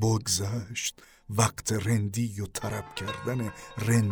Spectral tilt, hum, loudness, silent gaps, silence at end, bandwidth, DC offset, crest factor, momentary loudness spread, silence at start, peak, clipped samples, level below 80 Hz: -4.5 dB/octave; none; -30 LUFS; none; 0 s; over 20 kHz; under 0.1%; 20 dB; 8 LU; 0 s; -8 dBFS; under 0.1%; -54 dBFS